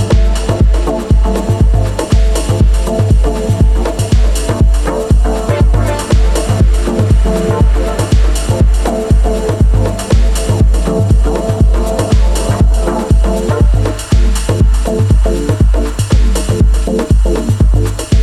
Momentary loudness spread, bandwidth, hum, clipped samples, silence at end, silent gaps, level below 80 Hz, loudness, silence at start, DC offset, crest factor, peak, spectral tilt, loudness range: 2 LU; 13 kHz; none; under 0.1%; 0 s; none; -12 dBFS; -12 LUFS; 0 s; under 0.1%; 10 dB; 0 dBFS; -6.5 dB/octave; 0 LU